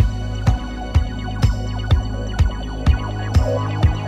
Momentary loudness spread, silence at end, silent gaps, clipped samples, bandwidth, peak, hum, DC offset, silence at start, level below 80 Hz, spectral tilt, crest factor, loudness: 5 LU; 0 s; none; under 0.1%; 9.4 kHz; -4 dBFS; none; under 0.1%; 0 s; -22 dBFS; -7 dB/octave; 14 dB; -21 LUFS